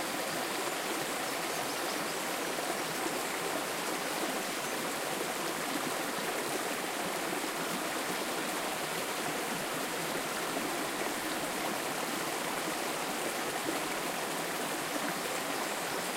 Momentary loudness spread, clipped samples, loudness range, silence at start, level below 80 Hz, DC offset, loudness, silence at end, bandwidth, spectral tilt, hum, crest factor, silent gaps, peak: 1 LU; under 0.1%; 0 LU; 0 s; -70 dBFS; under 0.1%; -34 LUFS; 0 s; 16 kHz; -2 dB/octave; none; 14 dB; none; -20 dBFS